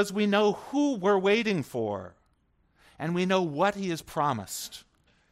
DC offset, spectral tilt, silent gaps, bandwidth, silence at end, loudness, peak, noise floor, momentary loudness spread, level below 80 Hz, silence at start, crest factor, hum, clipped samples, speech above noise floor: under 0.1%; -5 dB/octave; none; 16 kHz; 0.5 s; -27 LUFS; -12 dBFS; -69 dBFS; 13 LU; -66 dBFS; 0 s; 16 dB; none; under 0.1%; 42 dB